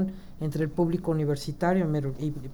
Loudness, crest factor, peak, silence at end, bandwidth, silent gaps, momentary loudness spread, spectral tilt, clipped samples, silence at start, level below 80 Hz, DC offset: -28 LUFS; 14 dB; -14 dBFS; 0 s; over 20 kHz; none; 7 LU; -8 dB/octave; under 0.1%; 0 s; -46 dBFS; under 0.1%